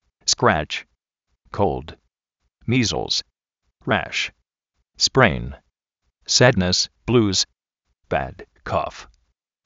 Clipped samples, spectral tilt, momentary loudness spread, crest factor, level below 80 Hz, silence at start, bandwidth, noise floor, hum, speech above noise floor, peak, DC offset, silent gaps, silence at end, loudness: under 0.1%; -3 dB/octave; 18 LU; 24 dB; -44 dBFS; 0.25 s; 8 kHz; -76 dBFS; none; 55 dB; 0 dBFS; under 0.1%; none; 0.65 s; -20 LUFS